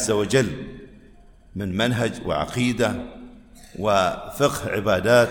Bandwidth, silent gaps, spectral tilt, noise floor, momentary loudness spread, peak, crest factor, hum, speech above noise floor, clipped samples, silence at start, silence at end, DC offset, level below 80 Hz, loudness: 17.5 kHz; none; -5 dB/octave; -49 dBFS; 19 LU; -4 dBFS; 18 dB; none; 27 dB; under 0.1%; 0 s; 0 s; under 0.1%; -46 dBFS; -22 LUFS